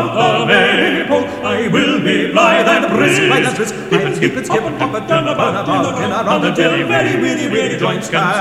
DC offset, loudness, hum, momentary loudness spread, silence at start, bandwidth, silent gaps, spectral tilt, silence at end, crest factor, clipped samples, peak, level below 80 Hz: under 0.1%; -13 LUFS; none; 6 LU; 0 s; 15.5 kHz; none; -4.5 dB/octave; 0 s; 14 dB; under 0.1%; 0 dBFS; -48 dBFS